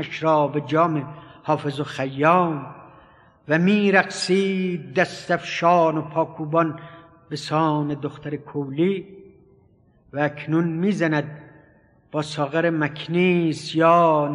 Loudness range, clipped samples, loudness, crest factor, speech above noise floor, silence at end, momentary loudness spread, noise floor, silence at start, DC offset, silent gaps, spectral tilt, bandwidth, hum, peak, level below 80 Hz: 6 LU; under 0.1%; -22 LUFS; 20 dB; 36 dB; 0 s; 13 LU; -57 dBFS; 0 s; under 0.1%; none; -6.5 dB/octave; 11 kHz; none; -2 dBFS; -64 dBFS